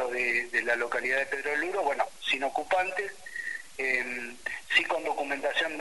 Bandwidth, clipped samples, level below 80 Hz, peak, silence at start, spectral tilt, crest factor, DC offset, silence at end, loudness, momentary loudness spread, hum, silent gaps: 11.5 kHz; under 0.1%; -66 dBFS; -10 dBFS; 0 s; -1.5 dB/octave; 20 dB; 0.4%; 0 s; -29 LUFS; 10 LU; none; none